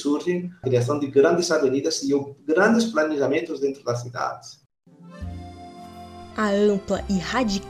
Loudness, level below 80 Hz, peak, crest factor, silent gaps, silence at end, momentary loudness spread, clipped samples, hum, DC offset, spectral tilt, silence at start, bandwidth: -22 LUFS; -48 dBFS; -6 dBFS; 18 dB; 4.66-4.70 s; 0 s; 20 LU; under 0.1%; none; under 0.1%; -5 dB/octave; 0 s; 14.5 kHz